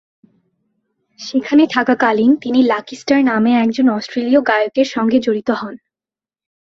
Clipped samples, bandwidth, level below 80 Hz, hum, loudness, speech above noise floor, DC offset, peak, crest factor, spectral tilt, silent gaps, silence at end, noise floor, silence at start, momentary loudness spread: under 0.1%; 7.4 kHz; -60 dBFS; none; -15 LUFS; over 76 dB; under 0.1%; 0 dBFS; 16 dB; -5.5 dB/octave; none; 0.95 s; under -90 dBFS; 1.2 s; 8 LU